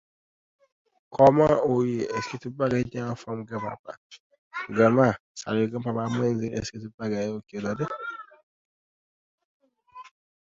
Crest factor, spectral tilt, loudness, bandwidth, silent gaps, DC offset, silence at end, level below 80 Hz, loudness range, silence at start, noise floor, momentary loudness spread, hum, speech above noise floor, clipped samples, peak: 22 dB; -7 dB/octave; -26 LUFS; 7.8 kHz; 3.79-3.84 s, 3.97-4.10 s, 4.20-4.30 s, 4.38-4.51 s, 5.20-5.35 s, 6.94-6.98 s, 8.43-9.38 s, 9.45-9.60 s; under 0.1%; 0.35 s; -58 dBFS; 10 LU; 1.1 s; -49 dBFS; 17 LU; none; 24 dB; under 0.1%; -4 dBFS